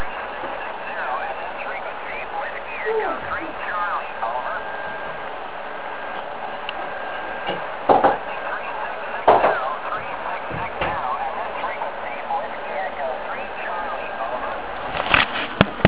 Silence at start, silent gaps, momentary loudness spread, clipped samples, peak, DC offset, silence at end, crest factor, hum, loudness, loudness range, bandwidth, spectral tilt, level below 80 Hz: 0 s; none; 12 LU; under 0.1%; 0 dBFS; 1%; 0 s; 24 dB; none; -24 LUFS; 6 LU; 4 kHz; -8.5 dB/octave; -48 dBFS